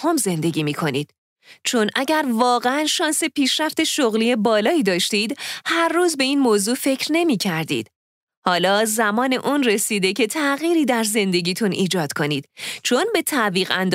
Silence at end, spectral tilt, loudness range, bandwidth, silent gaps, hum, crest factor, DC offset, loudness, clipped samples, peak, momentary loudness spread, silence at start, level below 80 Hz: 0 s; -3.5 dB/octave; 2 LU; 16 kHz; 1.18-1.36 s, 7.96-8.27 s, 8.37-8.42 s; none; 18 dB; under 0.1%; -19 LUFS; under 0.1%; -2 dBFS; 6 LU; 0 s; -70 dBFS